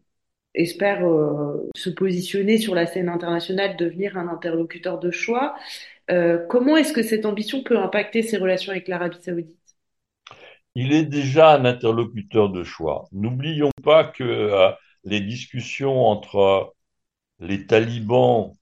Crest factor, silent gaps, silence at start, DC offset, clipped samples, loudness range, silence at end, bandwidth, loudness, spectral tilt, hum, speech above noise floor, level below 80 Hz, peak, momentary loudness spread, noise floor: 20 dB; 13.72-13.77 s; 0.55 s; under 0.1%; under 0.1%; 5 LU; 0.1 s; 12.5 kHz; -21 LUFS; -6 dB/octave; none; 60 dB; -60 dBFS; -2 dBFS; 12 LU; -80 dBFS